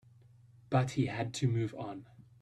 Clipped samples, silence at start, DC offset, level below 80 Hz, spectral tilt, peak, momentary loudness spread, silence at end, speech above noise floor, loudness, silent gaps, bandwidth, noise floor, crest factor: under 0.1%; 0.7 s; under 0.1%; -66 dBFS; -6.5 dB/octave; -16 dBFS; 12 LU; 0.2 s; 27 dB; -34 LUFS; none; 10.5 kHz; -60 dBFS; 20 dB